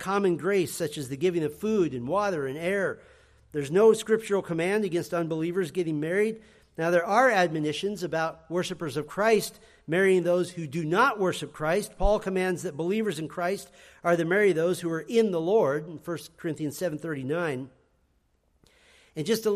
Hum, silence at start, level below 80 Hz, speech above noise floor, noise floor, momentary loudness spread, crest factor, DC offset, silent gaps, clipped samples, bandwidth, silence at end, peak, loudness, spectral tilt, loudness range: none; 0 s; -48 dBFS; 43 dB; -69 dBFS; 10 LU; 18 dB; under 0.1%; none; under 0.1%; 15 kHz; 0 s; -8 dBFS; -27 LUFS; -5.5 dB/octave; 3 LU